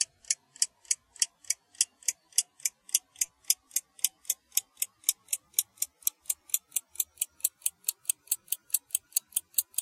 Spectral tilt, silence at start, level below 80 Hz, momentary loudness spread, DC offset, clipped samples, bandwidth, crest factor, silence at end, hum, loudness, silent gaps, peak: 5 dB/octave; 0 s; -80 dBFS; 6 LU; under 0.1%; under 0.1%; 16.5 kHz; 28 dB; 0 s; none; -30 LUFS; none; -6 dBFS